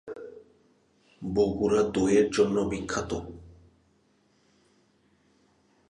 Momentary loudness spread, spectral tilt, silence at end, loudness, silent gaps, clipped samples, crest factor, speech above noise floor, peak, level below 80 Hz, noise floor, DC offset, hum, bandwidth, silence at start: 21 LU; -5.5 dB/octave; 2.4 s; -26 LUFS; none; under 0.1%; 20 dB; 41 dB; -10 dBFS; -52 dBFS; -67 dBFS; under 0.1%; none; 10.5 kHz; 0.05 s